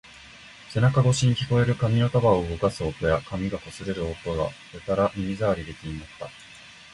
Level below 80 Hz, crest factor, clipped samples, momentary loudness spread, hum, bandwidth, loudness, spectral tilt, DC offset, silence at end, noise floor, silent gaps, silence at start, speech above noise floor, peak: -44 dBFS; 18 dB; under 0.1%; 21 LU; none; 11.5 kHz; -25 LUFS; -6.5 dB/octave; under 0.1%; 0.2 s; -47 dBFS; none; 0.15 s; 23 dB; -8 dBFS